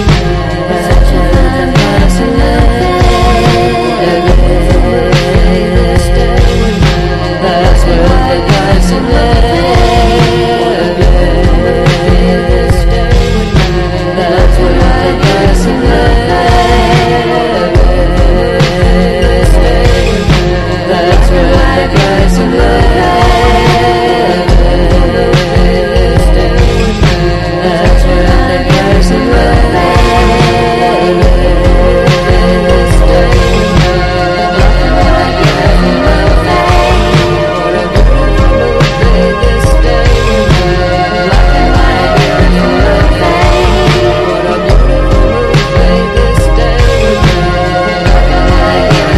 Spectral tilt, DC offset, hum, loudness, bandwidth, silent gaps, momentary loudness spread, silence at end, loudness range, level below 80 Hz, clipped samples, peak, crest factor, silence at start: -6 dB/octave; under 0.1%; none; -8 LUFS; 13 kHz; none; 2 LU; 0 s; 1 LU; -10 dBFS; 0.8%; 0 dBFS; 6 dB; 0 s